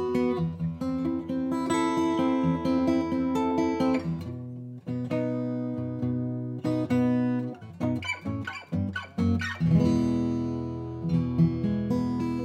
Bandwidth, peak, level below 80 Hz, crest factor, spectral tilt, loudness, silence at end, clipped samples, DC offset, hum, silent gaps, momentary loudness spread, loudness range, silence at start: 9.6 kHz; -12 dBFS; -56 dBFS; 16 dB; -7.5 dB/octave; -28 LUFS; 0 s; under 0.1%; under 0.1%; none; none; 9 LU; 3 LU; 0 s